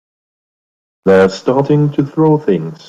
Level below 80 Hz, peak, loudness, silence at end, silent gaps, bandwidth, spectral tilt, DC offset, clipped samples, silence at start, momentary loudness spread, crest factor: -52 dBFS; -2 dBFS; -13 LUFS; 0.15 s; none; 7.8 kHz; -8 dB/octave; under 0.1%; under 0.1%; 1.05 s; 5 LU; 12 dB